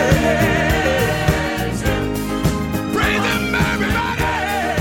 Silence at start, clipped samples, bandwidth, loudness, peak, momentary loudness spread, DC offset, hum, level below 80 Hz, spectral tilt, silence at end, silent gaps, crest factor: 0 s; under 0.1%; 17 kHz; -18 LUFS; 0 dBFS; 5 LU; under 0.1%; none; -28 dBFS; -5 dB/octave; 0 s; none; 18 dB